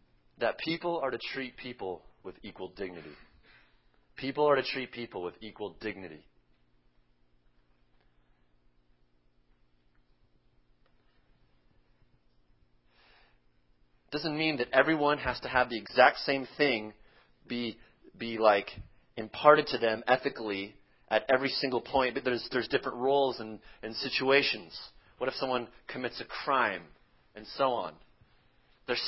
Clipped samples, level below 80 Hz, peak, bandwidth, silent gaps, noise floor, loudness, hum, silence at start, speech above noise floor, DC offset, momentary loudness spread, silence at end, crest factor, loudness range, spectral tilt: under 0.1%; -62 dBFS; -6 dBFS; 5.8 kHz; none; -67 dBFS; -30 LUFS; none; 0.4 s; 37 dB; under 0.1%; 19 LU; 0 s; 28 dB; 12 LU; -8 dB/octave